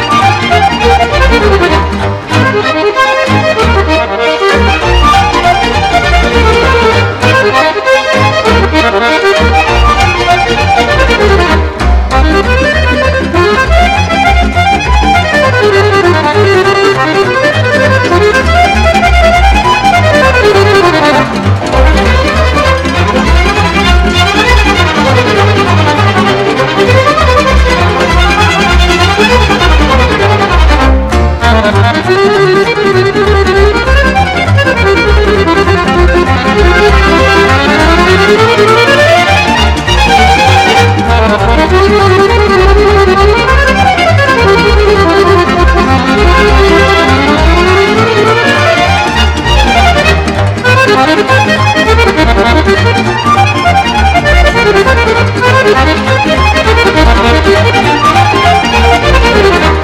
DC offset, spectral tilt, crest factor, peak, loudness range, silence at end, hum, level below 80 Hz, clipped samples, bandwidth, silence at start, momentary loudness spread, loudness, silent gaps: under 0.1%; -5.5 dB/octave; 6 dB; 0 dBFS; 2 LU; 0 s; none; -14 dBFS; 7%; 14.5 kHz; 0 s; 3 LU; -6 LUFS; none